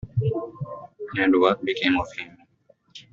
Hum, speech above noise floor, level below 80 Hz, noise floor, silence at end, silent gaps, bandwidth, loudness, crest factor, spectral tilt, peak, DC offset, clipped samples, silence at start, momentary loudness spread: none; 40 dB; -52 dBFS; -61 dBFS; 0.1 s; none; 7.4 kHz; -23 LUFS; 22 dB; -4.5 dB/octave; -4 dBFS; under 0.1%; under 0.1%; 0.05 s; 18 LU